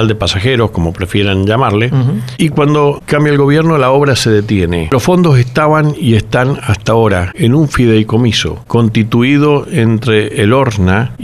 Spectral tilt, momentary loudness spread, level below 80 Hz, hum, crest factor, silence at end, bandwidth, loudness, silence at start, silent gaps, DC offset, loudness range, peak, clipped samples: -6.5 dB/octave; 4 LU; -34 dBFS; none; 10 dB; 0 s; 13.5 kHz; -11 LUFS; 0 s; none; 0.2%; 1 LU; 0 dBFS; under 0.1%